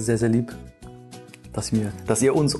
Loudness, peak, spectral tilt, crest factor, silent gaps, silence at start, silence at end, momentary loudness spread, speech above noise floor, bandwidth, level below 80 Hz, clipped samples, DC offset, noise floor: -24 LUFS; -8 dBFS; -5.5 dB/octave; 16 dB; none; 0 s; 0 s; 23 LU; 21 dB; 12.5 kHz; -46 dBFS; under 0.1%; under 0.1%; -43 dBFS